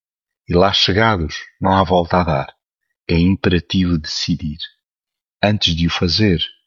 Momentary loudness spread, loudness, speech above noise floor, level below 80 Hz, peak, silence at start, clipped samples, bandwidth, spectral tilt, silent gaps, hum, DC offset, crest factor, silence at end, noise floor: 11 LU; -16 LUFS; 71 dB; -36 dBFS; -2 dBFS; 0.5 s; under 0.1%; 7.2 kHz; -5.5 dB/octave; none; none; under 0.1%; 16 dB; 0.15 s; -87 dBFS